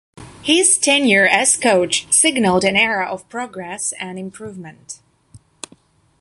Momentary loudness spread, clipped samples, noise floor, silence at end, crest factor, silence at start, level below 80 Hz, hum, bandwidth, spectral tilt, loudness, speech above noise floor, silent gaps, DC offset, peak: 24 LU; under 0.1%; -52 dBFS; 0.85 s; 18 dB; 0.2 s; -54 dBFS; none; 12 kHz; -2 dB/octave; -14 LUFS; 35 dB; none; under 0.1%; -2 dBFS